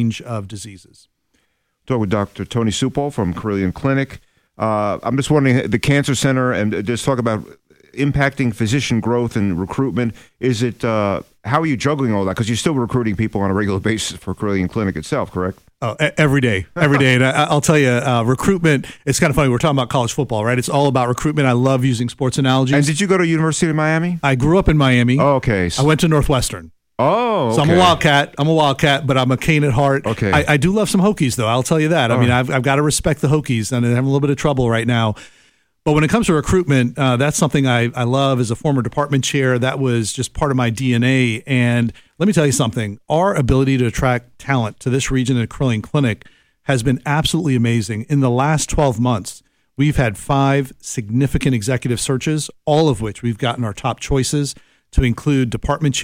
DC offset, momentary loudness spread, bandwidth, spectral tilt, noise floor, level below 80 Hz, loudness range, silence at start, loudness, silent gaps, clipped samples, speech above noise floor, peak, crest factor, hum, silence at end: under 0.1%; 7 LU; 16 kHz; -5.5 dB/octave; -66 dBFS; -36 dBFS; 4 LU; 0 s; -17 LUFS; none; under 0.1%; 50 dB; -2 dBFS; 14 dB; none; 0 s